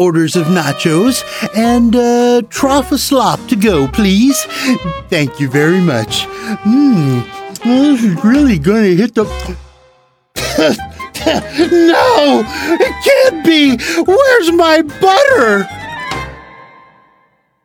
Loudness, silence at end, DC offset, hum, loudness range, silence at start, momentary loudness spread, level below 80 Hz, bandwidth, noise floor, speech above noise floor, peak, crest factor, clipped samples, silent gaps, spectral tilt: -11 LUFS; 1 s; under 0.1%; none; 4 LU; 0 s; 11 LU; -36 dBFS; 19 kHz; -55 dBFS; 45 dB; 0 dBFS; 12 dB; under 0.1%; none; -5 dB/octave